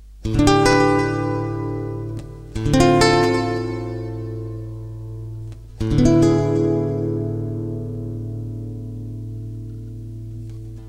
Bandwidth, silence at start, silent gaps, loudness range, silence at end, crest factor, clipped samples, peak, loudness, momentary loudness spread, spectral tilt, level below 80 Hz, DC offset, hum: 14 kHz; 0 s; none; 10 LU; 0 s; 20 dB; under 0.1%; 0 dBFS; -20 LUFS; 19 LU; -6 dB/octave; -34 dBFS; under 0.1%; none